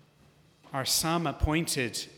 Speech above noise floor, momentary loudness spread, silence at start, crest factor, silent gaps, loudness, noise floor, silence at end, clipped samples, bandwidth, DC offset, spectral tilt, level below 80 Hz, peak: 32 dB; 7 LU; 0.65 s; 18 dB; none; -28 LUFS; -61 dBFS; 0 s; under 0.1%; 19 kHz; under 0.1%; -3.5 dB/octave; -42 dBFS; -12 dBFS